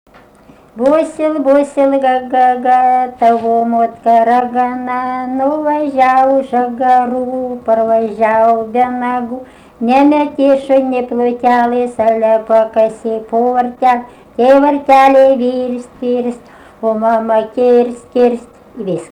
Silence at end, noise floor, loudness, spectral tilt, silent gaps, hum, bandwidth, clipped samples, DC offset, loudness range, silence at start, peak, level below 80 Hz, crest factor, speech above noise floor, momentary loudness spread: 0.05 s; -43 dBFS; -12 LUFS; -6 dB/octave; none; none; 10.5 kHz; under 0.1%; under 0.1%; 2 LU; 0.75 s; 0 dBFS; -52 dBFS; 12 dB; 31 dB; 9 LU